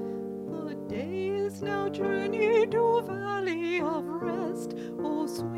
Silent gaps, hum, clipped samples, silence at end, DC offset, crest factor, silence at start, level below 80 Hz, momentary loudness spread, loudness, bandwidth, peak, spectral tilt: none; none; under 0.1%; 0 s; under 0.1%; 16 dB; 0 s; -66 dBFS; 11 LU; -30 LUFS; 15 kHz; -12 dBFS; -6 dB/octave